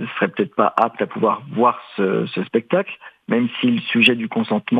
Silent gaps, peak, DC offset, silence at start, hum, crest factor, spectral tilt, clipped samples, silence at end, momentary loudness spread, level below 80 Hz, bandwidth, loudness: none; 0 dBFS; under 0.1%; 0 s; none; 18 dB; -7 dB/octave; under 0.1%; 0 s; 8 LU; -72 dBFS; 9 kHz; -19 LUFS